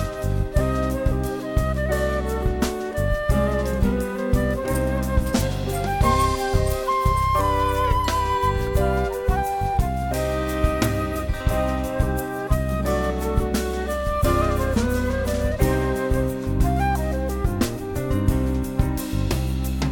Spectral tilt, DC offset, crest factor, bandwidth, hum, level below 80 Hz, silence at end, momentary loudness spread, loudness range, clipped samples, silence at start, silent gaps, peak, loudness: -6 dB/octave; under 0.1%; 16 dB; 18 kHz; none; -26 dBFS; 0 s; 4 LU; 2 LU; under 0.1%; 0 s; none; -6 dBFS; -23 LUFS